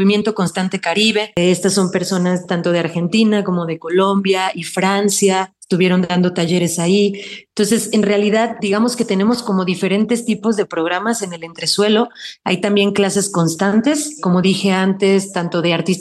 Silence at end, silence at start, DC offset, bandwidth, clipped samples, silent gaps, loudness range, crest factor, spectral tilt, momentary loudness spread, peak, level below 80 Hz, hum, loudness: 0 s; 0 s; under 0.1%; 12.5 kHz; under 0.1%; none; 2 LU; 12 dB; -4.5 dB/octave; 5 LU; -4 dBFS; -60 dBFS; none; -16 LUFS